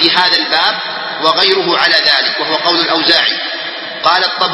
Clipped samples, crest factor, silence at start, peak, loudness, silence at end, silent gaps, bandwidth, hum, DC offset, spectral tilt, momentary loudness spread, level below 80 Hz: 0.2%; 12 dB; 0 s; 0 dBFS; -11 LUFS; 0 s; none; 11 kHz; none; under 0.1%; -3 dB/octave; 9 LU; -58 dBFS